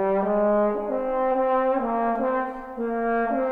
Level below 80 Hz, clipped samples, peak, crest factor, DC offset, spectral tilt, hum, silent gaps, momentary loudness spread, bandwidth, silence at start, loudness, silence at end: -50 dBFS; under 0.1%; -12 dBFS; 12 dB; under 0.1%; -9 dB/octave; none; none; 6 LU; 4.2 kHz; 0 s; -24 LUFS; 0 s